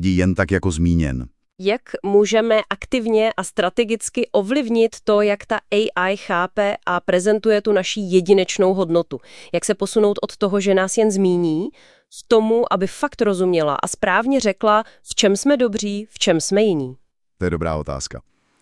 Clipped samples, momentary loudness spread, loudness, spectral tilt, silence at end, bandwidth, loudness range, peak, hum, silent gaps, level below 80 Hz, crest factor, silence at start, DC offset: under 0.1%; 8 LU; -19 LUFS; -5 dB/octave; 0.4 s; 12 kHz; 1 LU; 0 dBFS; none; none; -44 dBFS; 18 dB; 0 s; 0.3%